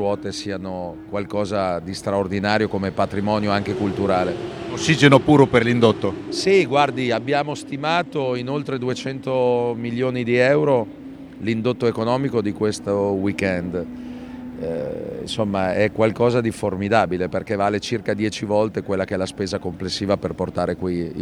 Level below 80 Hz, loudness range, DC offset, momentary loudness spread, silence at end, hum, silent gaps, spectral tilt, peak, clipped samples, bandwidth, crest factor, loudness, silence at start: -50 dBFS; 6 LU; under 0.1%; 12 LU; 0 s; none; none; -6 dB/octave; 0 dBFS; under 0.1%; 13 kHz; 20 dB; -21 LUFS; 0 s